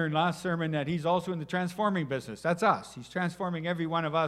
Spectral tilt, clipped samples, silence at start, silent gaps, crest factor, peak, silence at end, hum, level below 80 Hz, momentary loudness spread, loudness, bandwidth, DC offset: -6.5 dB/octave; under 0.1%; 0 s; none; 20 dB; -10 dBFS; 0 s; none; -66 dBFS; 6 LU; -30 LUFS; 13.5 kHz; under 0.1%